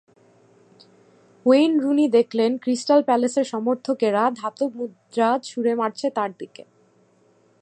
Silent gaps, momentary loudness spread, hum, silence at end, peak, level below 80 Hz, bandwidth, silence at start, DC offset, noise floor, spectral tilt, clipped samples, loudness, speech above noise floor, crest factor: none; 10 LU; none; 1.15 s; -4 dBFS; -80 dBFS; 9.6 kHz; 1.45 s; under 0.1%; -59 dBFS; -5 dB/octave; under 0.1%; -21 LUFS; 39 dB; 18 dB